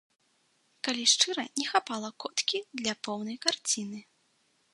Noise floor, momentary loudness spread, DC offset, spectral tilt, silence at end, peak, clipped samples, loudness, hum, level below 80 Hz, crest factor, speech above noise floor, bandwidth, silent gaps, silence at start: -71 dBFS; 12 LU; under 0.1%; -0.5 dB/octave; 0.7 s; -6 dBFS; under 0.1%; -29 LUFS; none; -80 dBFS; 26 dB; 40 dB; 11.5 kHz; none; 0.85 s